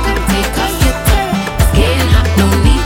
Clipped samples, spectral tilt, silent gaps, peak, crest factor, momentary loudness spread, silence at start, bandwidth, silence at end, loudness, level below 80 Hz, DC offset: under 0.1%; -5 dB/octave; none; 0 dBFS; 10 dB; 3 LU; 0 s; 17 kHz; 0 s; -12 LUFS; -14 dBFS; under 0.1%